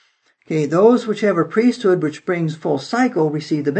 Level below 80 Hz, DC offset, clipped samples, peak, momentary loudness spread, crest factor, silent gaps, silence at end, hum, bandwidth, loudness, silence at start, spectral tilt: -72 dBFS; under 0.1%; under 0.1%; -2 dBFS; 8 LU; 16 dB; none; 0 s; none; 8.6 kHz; -18 LUFS; 0.5 s; -7 dB/octave